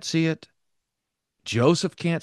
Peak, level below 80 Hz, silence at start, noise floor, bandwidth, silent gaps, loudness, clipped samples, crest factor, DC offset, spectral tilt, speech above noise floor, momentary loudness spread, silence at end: -6 dBFS; -68 dBFS; 0 s; -83 dBFS; 12 kHz; none; -23 LUFS; under 0.1%; 20 dB; under 0.1%; -5.5 dB/octave; 60 dB; 13 LU; 0 s